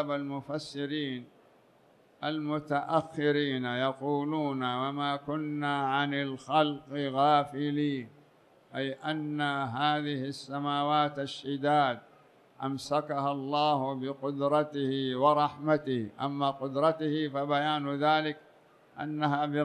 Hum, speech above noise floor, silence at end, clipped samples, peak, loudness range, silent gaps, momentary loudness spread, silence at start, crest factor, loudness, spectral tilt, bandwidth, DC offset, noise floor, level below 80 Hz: none; 32 dB; 0 s; under 0.1%; -10 dBFS; 3 LU; none; 9 LU; 0 s; 20 dB; -30 LUFS; -6.5 dB/octave; 11 kHz; under 0.1%; -62 dBFS; -76 dBFS